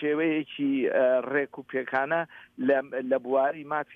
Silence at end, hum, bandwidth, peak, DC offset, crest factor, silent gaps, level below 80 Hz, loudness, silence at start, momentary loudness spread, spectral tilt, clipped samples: 0 s; none; 4.5 kHz; -12 dBFS; under 0.1%; 16 dB; none; -78 dBFS; -27 LUFS; 0 s; 8 LU; -8 dB/octave; under 0.1%